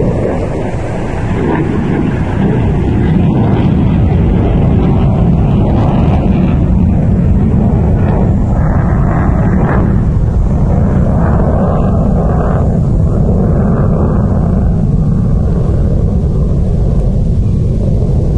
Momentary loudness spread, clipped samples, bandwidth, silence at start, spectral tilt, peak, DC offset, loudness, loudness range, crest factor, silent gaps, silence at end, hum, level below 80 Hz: 3 LU; under 0.1%; 8.8 kHz; 0 s; -10 dB/octave; 0 dBFS; 3%; -11 LUFS; 2 LU; 10 dB; none; 0 s; none; -16 dBFS